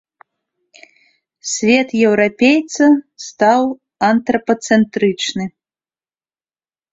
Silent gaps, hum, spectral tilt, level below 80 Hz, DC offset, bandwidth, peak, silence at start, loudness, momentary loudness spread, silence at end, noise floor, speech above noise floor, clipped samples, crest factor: none; none; -4 dB/octave; -58 dBFS; under 0.1%; 8 kHz; -2 dBFS; 1.45 s; -15 LUFS; 10 LU; 1.45 s; under -90 dBFS; over 76 dB; under 0.1%; 16 dB